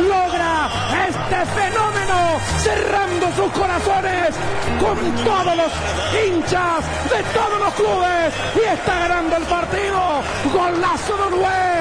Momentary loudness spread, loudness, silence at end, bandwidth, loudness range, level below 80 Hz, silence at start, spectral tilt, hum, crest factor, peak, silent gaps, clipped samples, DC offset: 3 LU; -18 LUFS; 0 s; 10.5 kHz; 1 LU; -36 dBFS; 0 s; -4.5 dB/octave; none; 14 dB; -4 dBFS; none; under 0.1%; under 0.1%